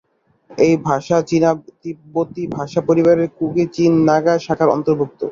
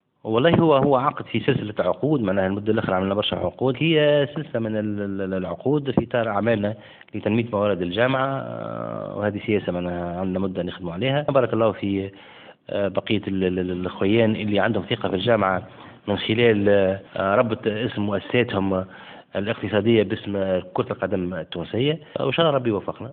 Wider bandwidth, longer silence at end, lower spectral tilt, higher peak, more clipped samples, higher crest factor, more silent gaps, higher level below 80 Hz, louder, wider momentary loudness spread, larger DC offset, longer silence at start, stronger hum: first, 7.4 kHz vs 4.5 kHz; about the same, 0 s vs 0 s; second, -7 dB/octave vs -11.5 dB/octave; about the same, -2 dBFS vs -2 dBFS; neither; second, 14 dB vs 20 dB; neither; about the same, -54 dBFS vs -56 dBFS; first, -17 LUFS vs -23 LUFS; about the same, 11 LU vs 10 LU; neither; first, 0.5 s vs 0.25 s; neither